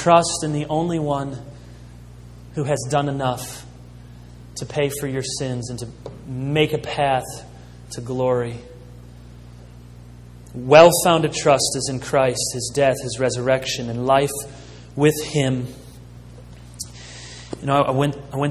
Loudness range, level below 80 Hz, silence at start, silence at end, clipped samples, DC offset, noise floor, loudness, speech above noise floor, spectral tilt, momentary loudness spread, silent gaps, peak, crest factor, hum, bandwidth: 10 LU; -46 dBFS; 0 s; 0 s; under 0.1%; under 0.1%; -41 dBFS; -20 LUFS; 21 dB; -4.5 dB/octave; 20 LU; none; 0 dBFS; 22 dB; 60 Hz at -40 dBFS; 14 kHz